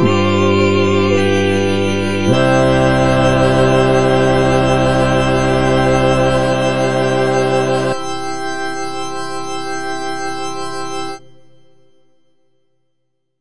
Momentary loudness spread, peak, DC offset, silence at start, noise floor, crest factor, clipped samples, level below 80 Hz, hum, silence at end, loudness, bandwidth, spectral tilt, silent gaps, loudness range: 11 LU; 0 dBFS; 4%; 0 s; -71 dBFS; 14 dB; under 0.1%; -34 dBFS; none; 0 s; -15 LUFS; 10 kHz; -6 dB/octave; none; 12 LU